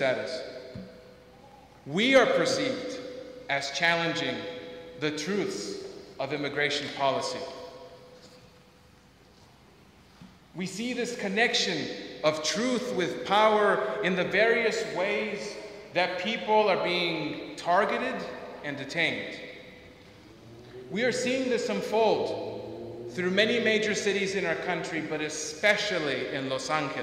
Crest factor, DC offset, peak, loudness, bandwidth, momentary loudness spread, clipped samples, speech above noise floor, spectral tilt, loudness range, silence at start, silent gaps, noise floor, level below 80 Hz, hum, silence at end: 20 dB; under 0.1%; -8 dBFS; -28 LUFS; 15.5 kHz; 17 LU; under 0.1%; 29 dB; -3.5 dB/octave; 7 LU; 0 s; none; -57 dBFS; -66 dBFS; none; 0 s